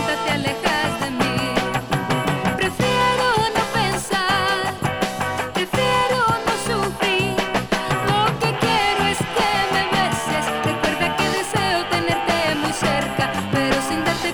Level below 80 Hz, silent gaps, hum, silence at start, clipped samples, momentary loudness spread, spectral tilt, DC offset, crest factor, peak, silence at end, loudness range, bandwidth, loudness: -42 dBFS; none; none; 0 s; under 0.1%; 4 LU; -4 dB/octave; under 0.1%; 16 dB; -4 dBFS; 0 s; 1 LU; over 20 kHz; -20 LUFS